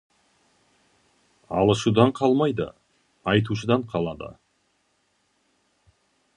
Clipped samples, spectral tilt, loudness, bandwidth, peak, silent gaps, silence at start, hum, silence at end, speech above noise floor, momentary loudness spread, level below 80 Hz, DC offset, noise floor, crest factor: under 0.1%; -6.5 dB/octave; -23 LUFS; 11 kHz; -2 dBFS; none; 1.5 s; none; 2.05 s; 47 dB; 14 LU; -54 dBFS; under 0.1%; -69 dBFS; 24 dB